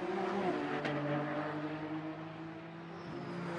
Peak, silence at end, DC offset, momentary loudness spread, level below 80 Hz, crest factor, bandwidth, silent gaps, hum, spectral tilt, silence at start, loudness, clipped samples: -22 dBFS; 0 s; under 0.1%; 11 LU; -74 dBFS; 16 dB; 10.5 kHz; none; none; -7 dB/octave; 0 s; -39 LUFS; under 0.1%